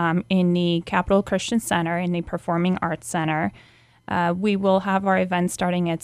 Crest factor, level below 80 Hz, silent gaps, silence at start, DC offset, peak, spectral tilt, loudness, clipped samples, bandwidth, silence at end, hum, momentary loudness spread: 16 dB; -50 dBFS; none; 0 s; under 0.1%; -6 dBFS; -6 dB/octave; -22 LUFS; under 0.1%; 14 kHz; 0.05 s; none; 5 LU